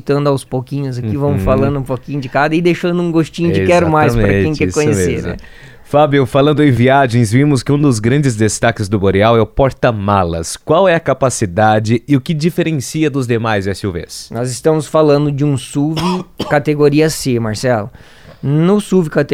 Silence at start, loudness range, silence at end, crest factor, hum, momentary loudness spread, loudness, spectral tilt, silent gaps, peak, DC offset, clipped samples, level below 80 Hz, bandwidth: 0.05 s; 3 LU; 0 s; 12 dB; none; 9 LU; -13 LUFS; -6 dB/octave; none; 0 dBFS; under 0.1%; under 0.1%; -34 dBFS; 16 kHz